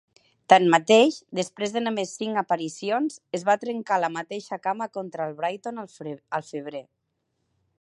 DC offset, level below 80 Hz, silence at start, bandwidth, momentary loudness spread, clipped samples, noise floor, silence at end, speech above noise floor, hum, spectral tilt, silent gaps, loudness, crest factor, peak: under 0.1%; -78 dBFS; 0.5 s; 11.5 kHz; 17 LU; under 0.1%; -76 dBFS; 1 s; 52 dB; none; -4 dB/octave; none; -24 LUFS; 24 dB; -2 dBFS